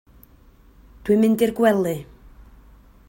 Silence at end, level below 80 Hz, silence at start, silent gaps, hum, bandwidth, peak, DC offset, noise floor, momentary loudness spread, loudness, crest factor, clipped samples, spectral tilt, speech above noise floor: 1.05 s; -50 dBFS; 1.05 s; none; none; 16.5 kHz; -6 dBFS; under 0.1%; -51 dBFS; 13 LU; -20 LUFS; 16 dB; under 0.1%; -6.5 dB/octave; 33 dB